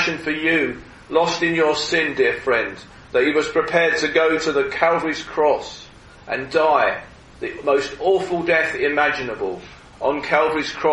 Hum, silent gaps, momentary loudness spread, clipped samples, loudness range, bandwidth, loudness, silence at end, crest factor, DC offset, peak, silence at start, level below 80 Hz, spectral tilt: none; none; 11 LU; under 0.1%; 2 LU; 11 kHz; -19 LUFS; 0 s; 20 dB; under 0.1%; -2 dBFS; 0 s; -50 dBFS; -4 dB/octave